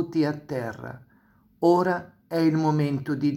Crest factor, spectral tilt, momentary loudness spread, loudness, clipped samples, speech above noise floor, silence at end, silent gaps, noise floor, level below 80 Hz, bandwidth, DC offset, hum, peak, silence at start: 18 dB; -8 dB/octave; 12 LU; -25 LUFS; under 0.1%; 36 dB; 0 s; none; -60 dBFS; -64 dBFS; 15.5 kHz; under 0.1%; none; -8 dBFS; 0 s